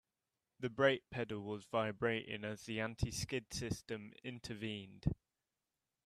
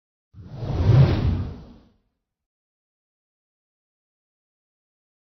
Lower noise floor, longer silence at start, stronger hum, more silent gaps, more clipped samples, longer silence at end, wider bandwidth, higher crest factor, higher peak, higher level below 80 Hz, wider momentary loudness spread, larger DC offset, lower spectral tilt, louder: first, under -90 dBFS vs -73 dBFS; first, 0.6 s vs 0.35 s; neither; neither; neither; second, 0.9 s vs 3.6 s; first, 14 kHz vs 6.2 kHz; about the same, 22 dB vs 20 dB; second, -18 dBFS vs -4 dBFS; second, -58 dBFS vs -38 dBFS; second, 12 LU vs 18 LU; neither; second, -5 dB/octave vs -9 dB/octave; second, -41 LUFS vs -20 LUFS